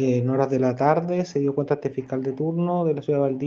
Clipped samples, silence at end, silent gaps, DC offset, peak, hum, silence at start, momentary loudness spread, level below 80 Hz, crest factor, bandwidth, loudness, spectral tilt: under 0.1%; 0 s; none; under 0.1%; -4 dBFS; none; 0 s; 5 LU; -66 dBFS; 18 dB; 7.2 kHz; -23 LUFS; -8.5 dB/octave